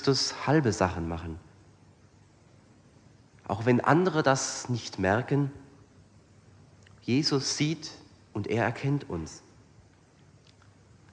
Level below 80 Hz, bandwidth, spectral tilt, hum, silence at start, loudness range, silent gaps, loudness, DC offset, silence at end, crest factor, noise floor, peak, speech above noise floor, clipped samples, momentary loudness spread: -56 dBFS; 10 kHz; -5 dB/octave; none; 0 s; 6 LU; none; -28 LUFS; under 0.1%; 1.75 s; 22 dB; -58 dBFS; -8 dBFS; 31 dB; under 0.1%; 17 LU